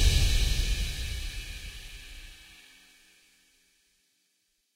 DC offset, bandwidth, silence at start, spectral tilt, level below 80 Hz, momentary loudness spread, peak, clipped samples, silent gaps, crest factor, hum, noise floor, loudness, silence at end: under 0.1%; 16 kHz; 0 s; -3 dB/octave; -32 dBFS; 24 LU; -10 dBFS; under 0.1%; none; 20 dB; none; -75 dBFS; -31 LUFS; 2.4 s